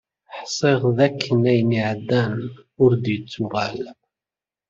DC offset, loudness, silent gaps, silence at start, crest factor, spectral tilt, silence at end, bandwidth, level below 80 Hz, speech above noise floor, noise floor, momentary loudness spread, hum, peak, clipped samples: under 0.1%; -21 LUFS; none; 0.3 s; 18 dB; -6.5 dB/octave; 0.75 s; 7.6 kHz; -58 dBFS; over 70 dB; under -90 dBFS; 16 LU; none; -2 dBFS; under 0.1%